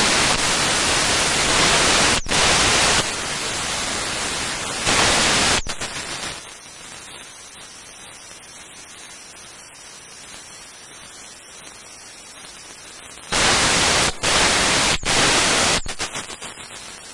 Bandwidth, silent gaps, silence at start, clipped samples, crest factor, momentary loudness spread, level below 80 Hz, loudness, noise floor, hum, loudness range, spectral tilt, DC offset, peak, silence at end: 11.5 kHz; none; 0 s; under 0.1%; 16 dB; 23 LU; -40 dBFS; -17 LUFS; -41 dBFS; none; 21 LU; -1 dB/octave; under 0.1%; -6 dBFS; 0 s